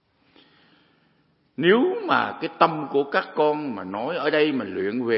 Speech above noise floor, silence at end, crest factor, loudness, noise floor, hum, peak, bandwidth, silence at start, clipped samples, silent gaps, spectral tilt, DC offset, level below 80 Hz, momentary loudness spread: 42 dB; 0 s; 22 dB; -23 LUFS; -64 dBFS; none; -2 dBFS; 5.8 kHz; 1.6 s; under 0.1%; none; -10 dB/octave; under 0.1%; -76 dBFS; 9 LU